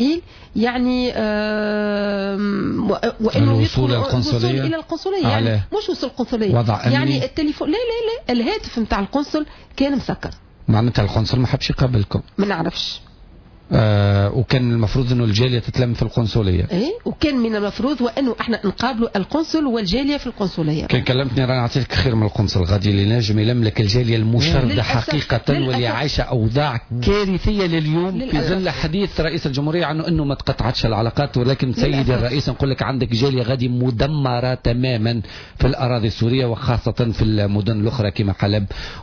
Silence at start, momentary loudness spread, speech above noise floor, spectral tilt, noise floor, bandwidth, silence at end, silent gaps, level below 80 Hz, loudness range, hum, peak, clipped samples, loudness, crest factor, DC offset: 0 s; 5 LU; 25 dB; -7 dB/octave; -43 dBFS; 5.4 kHz; 0 s; none; -34 dBFS; 2 LU; none; -4 dBFS; under 0.1%; -19 LUFS; 14 dB; under 0.1%